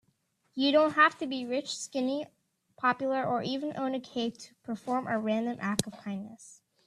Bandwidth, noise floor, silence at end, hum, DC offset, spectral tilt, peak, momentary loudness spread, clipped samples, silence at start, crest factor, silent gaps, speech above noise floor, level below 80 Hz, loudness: 13.5 kHz; -74 dBFS; 0.35 s; none; under 0.1%; -4 dB/octave; -6 dBFS; 15 LU; under 0.1%; 0.55 s; 24 dB; none; 44 dB; -74 dBFS; -30 LUFS